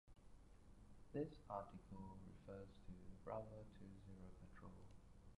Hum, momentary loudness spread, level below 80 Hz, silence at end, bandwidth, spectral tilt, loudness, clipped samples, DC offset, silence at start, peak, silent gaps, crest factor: none; 16 LU; -68 dBFS; 0.05 s; 11 kHz; -8 dB/octave; -57 LUFS; under 0.1%; under 0.1%; 0.05 s; -36 dBFS; none; 20 dB